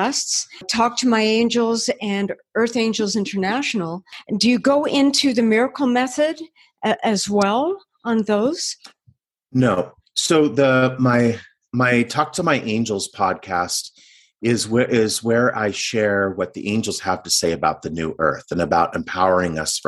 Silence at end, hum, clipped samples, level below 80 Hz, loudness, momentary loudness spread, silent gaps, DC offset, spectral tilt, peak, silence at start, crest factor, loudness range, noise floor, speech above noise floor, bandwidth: 0.1 s; none; under 0.1%; -54 dBFS; -20 LUFS; 8 LU; none; under 0.1%; -4 dB/octave; -2 dBFS; 0 s; 18 dB; 3 LU; -59 dBFS; 40 dB; 12.5 kHz